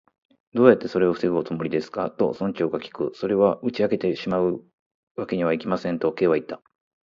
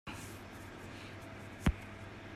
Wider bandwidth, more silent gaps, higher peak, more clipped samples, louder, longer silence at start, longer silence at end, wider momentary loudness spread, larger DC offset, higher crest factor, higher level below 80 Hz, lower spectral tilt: second, 7.4 kHz vs 15.5 kHz; first, 4.73-5.15 s vs none; first, 0 dBFS vs -18 dBFS; neither; first, -23 LUFS vs -43 LUFS; first, 0.55 s vs 0.05 s; first, 0.45 s vs 0 s; about the same, 12 LU vs 12 LU; neither; about the same, 22 dB vs 24 dB; second, -60 dBFS vs -48 dBFS; first, -8 dB/octave vs -5.5 dB/octave